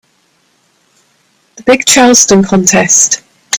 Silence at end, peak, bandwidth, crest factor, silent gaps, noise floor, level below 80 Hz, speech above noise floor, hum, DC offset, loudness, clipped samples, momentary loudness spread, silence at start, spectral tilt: 0 s; 0 dBFS; over 20 kHz; 10 dB; none; -54 dBFS; -46 dBFS; 47 dB; none; under 0.1%; -7 LUFS; 0.6%; 8 LU; 1.55 s; -2.5 dB/octave